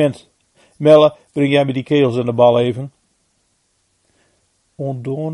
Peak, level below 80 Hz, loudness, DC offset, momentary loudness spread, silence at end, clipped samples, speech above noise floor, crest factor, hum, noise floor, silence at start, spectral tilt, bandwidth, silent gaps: 0 dBFS; -60 dBFS; -15 LUFS; under 0.1%; 17 LU; 0 s; under 0.1%; 50 dB; 16 dB; none; -64 dBFS; 0 s; -7.5 dB/octave; 11.5 kHz; none